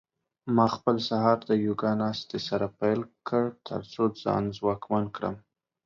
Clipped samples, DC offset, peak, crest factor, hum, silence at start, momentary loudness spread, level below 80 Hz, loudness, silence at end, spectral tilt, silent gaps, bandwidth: under 0.1%; under 0.1%; -8 dBFS; 20 dB; none; 0.45 s; 10 LU; -62 dBFS; -28 LUFS; 0.45 s; -7 dB/octave; none; 7.2 kHz